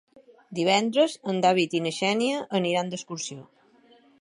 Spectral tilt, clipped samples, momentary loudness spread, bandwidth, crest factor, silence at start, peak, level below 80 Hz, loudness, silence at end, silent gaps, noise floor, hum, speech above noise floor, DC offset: -4 dB/octave; under 0.1%; 12 LU; 11.5 kHz; 20 dB; 0.15 s; -6 dBFS; -76 dBFS; -25 LUFS; 0.8 s; none; -58 dBFS; none; 33 dB; under 0.1%